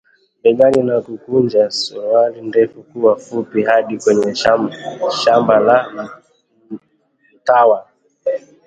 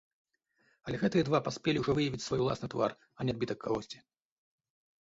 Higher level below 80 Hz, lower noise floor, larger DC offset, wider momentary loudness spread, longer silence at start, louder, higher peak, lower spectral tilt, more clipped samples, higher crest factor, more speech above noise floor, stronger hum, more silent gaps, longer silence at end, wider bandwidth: about the same, -58 dBFS vs -60 dBFS; second, -59 dBFS vs -73 dBFS; neither; first, 13 LU vs 10 LU; second, 0.45 s vs 0.85 s; first, -15 LUFS vs -33 LUFS; first, 0 dBFS vs -14 dBFS; about the same, -5 dB/octave vs -6 dB/octave; neither; about the same, 16 dB vs 20 dB; first, 45 dB vs 41 dB; neither; neither; second, 0.3 s vs 1.05 s; first, 9.2 kHz vs 8 kHz